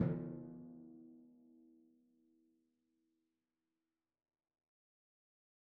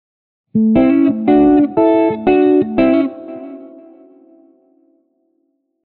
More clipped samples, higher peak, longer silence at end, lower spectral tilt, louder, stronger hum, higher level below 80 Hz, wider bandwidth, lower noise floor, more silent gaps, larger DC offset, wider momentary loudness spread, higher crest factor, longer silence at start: neither; second, -22 dBFS vs -4 dBFS; first, 3.95 s vs 2.2 s; first, -9.5 dB/octave vs -7 dB/octave; second, -47 LUFS vs -13 LUFS; neither; second, -78 dBFS vs -46 dBFS; second, 2.7 kHz vs 4.3 kHz; first, under -90 dBFS vs -66 dBFS; neither; neither; first, 23 LU vs 19 LU; first, 28 dB vs 12 dB; second, 0 s vs 0.55 s